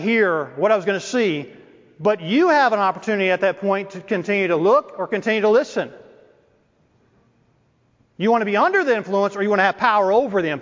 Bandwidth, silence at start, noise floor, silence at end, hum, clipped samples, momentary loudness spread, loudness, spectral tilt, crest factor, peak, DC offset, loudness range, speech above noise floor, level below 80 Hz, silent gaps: 7.6 kHz; 0 s; -61 dBFS; 0 s; none; under 0.1%; 8 LU; -19 LUFS; -5.5 dB/octave; 18 dB; -2 dBFS; under 0.1%; 6 LU; 43 dB; -68 dBFS; none